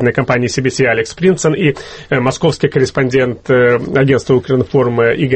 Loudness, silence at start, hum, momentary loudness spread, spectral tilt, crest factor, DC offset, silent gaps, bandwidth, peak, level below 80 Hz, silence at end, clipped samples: -13 LUFS; 0 s; none; 4 LU; -6 dB/octave; 12 dB; under 0.1%; none; 8.8 kHz; 0 dBFS; -42 dBFS; 0 s; under 0.1%